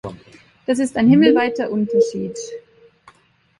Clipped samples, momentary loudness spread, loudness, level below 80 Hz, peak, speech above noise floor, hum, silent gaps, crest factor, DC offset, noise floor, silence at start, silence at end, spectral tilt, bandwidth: under 0.1%; 20 LU; -17 LUFS; -56 dBFS; -2 dBFS; 40 dB; none; none; 18 dB; under 0.1%; -56 dBFS; 0.05 s; 1 s; -6 dB/octave; 11.5 kHz